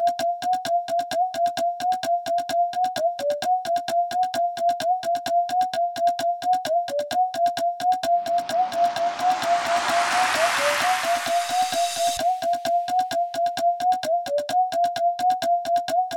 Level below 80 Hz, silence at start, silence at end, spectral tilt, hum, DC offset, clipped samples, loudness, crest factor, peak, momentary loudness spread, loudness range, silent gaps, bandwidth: -64 dBFS; 0 s; 0 s; -1.5 dB/octave; none; under 0.1%; under 0.1%; -23 LUFS; 14 dB; -8 dBFS; 4 LU; 2 LU; none; 18 kHz